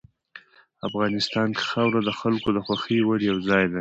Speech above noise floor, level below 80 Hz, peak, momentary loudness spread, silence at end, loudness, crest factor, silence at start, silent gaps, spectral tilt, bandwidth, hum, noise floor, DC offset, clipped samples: 26 dB; -56 dBFS; -6 dBFS; 4 LU; 0 s; -24 LUFS; 18 dB; 0.35 s; none; -6 dB/octave; 8.2 kHz; none; -50 dBFS; under 0.1%; under 0.1%